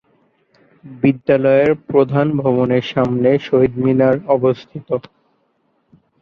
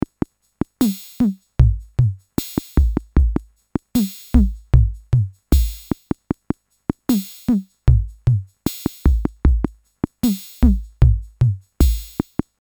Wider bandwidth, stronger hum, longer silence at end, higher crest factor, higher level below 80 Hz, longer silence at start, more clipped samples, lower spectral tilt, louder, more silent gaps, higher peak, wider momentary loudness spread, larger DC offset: second, 6.4 kHz vs over 20 kHz; neither; first, 1.2 s vs 0.5 s; about the same, 16 dB vs 18 dB; second, -52 dBFS vs -22 dBFS; about the same, 0.85 s vs 0.8 s; neither; first, -9 dB/octave vs -7.5 dB/octave; first, -16 LUFS vs -21 LUFS; neither; about the same, -2 dBFS vs 0 dBFS; about the same, 9 LU vs 10 LU; neither